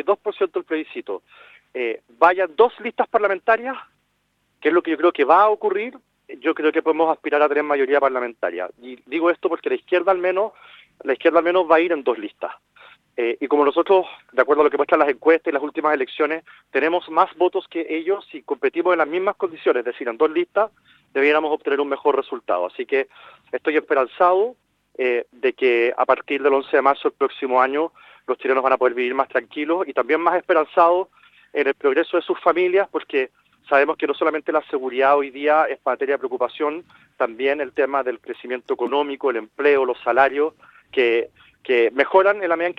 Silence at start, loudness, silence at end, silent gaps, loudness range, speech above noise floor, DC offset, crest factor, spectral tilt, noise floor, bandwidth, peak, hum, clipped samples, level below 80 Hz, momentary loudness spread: 0.05 s; -20 LUFS; 0.05 s; none; 3 LU; 49 dB; under 0.1%; 20 dB; -6 dB/octave; -69 dBFS; 5.6 kHz; 0 dBFS; none; under 0.1%; -70 dBFS; 10 LU